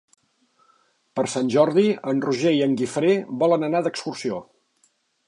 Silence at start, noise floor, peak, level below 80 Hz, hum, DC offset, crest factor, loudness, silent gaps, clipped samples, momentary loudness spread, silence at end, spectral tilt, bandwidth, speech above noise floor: 1.15 s; -66 dBFS; -6 dBFS; -72 dBFS; none; under 0.1%; 18 dB; -22 LUFS; none; under 0.1%; 10 LU; 0.85 s; -5.5 dB/octave; 11 kHz; 45 dB